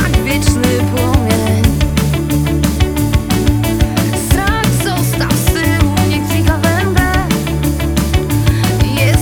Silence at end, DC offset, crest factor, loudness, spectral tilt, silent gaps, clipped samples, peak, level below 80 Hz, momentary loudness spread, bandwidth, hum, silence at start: 0 s; under 0.1%; 12 dB; -13 LUFS; -5.5 dB/octave; none; under 0.1%; 0 dBFS; -20 dBFS; 2 LU; over 20 kHz; none; 0 s